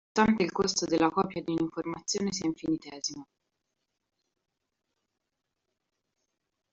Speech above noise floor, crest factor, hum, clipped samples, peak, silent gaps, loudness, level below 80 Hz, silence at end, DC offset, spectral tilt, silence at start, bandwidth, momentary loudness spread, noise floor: 55 dB; 22 dB; none; under 0.1%; -10 dBFS; none; -29 LUFS; -64 dBFS; 3.5 s; under 0.1%; -4 dB/octave; 0.15 s; 8.2 kHz; 10 LU; -84 dBFS